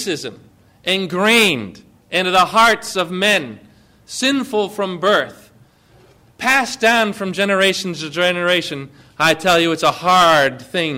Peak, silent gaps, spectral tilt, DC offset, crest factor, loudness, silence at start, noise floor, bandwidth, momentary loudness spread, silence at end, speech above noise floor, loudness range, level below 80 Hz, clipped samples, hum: -4 dBFS; none; -3 dB/octave; under 0.1%; 14 dB; -16 LUFS; 0 s; -50 dBFS; 16 kHz; 13 LU; 0 s; 34 dB; 4 LU; -54 dBFS; under 0.1%; none